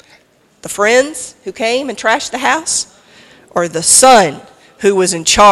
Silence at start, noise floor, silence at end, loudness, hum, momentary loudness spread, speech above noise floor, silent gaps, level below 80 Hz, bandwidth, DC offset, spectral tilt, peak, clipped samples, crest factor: 0.65 s; -50 dBFS; 0 s; -12 LUFS; none; 17 LU; 38 dB; none; -42 dBFS; over 20 kHz; under 0.1%; -1.5 dB/octave; 0 dBFS; 0.6%; 14 dB